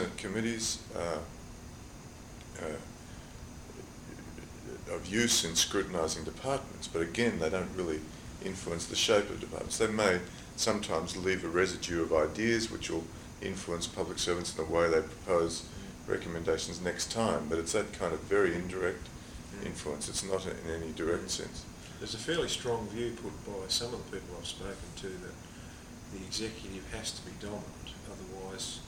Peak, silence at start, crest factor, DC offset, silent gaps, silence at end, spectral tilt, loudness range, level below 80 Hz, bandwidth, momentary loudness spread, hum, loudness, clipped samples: -12 dBFS; 0 s; 24 dB; under 0.1%; none; 0 s; -3.5 dB/octave; 10 LU; -54 dBFS; 18.5 kHz; 18 LU; none; -33 LUFS; under 0.1%